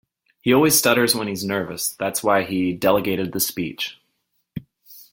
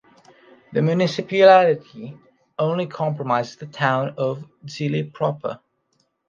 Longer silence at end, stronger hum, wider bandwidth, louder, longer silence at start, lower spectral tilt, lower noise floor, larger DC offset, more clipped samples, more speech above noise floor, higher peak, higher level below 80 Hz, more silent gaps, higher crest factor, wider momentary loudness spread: second, 0.1 s vs 0.75 s; neither; first, 17 kHz vs 7.4 kHz; about the same, -20 LUFS vs -20 LUFS; second, 0.45 s vs 0.7 s; second, -3.5 dB/octave vs -6.5 dB/octave; about the same, -72 dBFS vs -69 dBFS; neither; neither; about the same, 51 dB vs 48 dB; about the same, -2 dBFS vs -2 dBFS; first, -58 dBFS vs -68 dBFS; neither; about the same, 20 dB vs 20 dB; second, 14 LU vs 22 LU